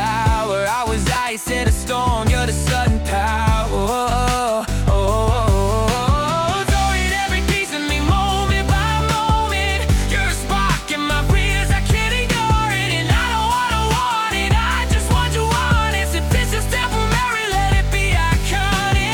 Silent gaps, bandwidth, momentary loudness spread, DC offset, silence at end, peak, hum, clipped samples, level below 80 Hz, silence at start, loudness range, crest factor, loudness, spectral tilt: none; 18 kHz; 2 LU; under 0.1%; 0 s; -4 dBFS; none; under 0.1%; -22 dBFS; 0 s; 1 LU; 14 dB; -18 LUFS; -4.5 dB/octave